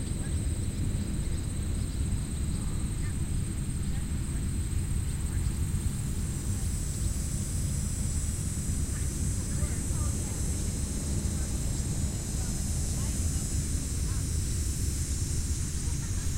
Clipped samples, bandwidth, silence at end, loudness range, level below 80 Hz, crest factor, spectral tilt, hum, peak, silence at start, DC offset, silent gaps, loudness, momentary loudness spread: under 0.1%; 16 kHz; 0 s; 2 LU; -34 dBFS; 14 dB; -5 dB/octave; none; -16 dBFS; 0 s; under 0.1%; none; -32 LUFS; 2 LU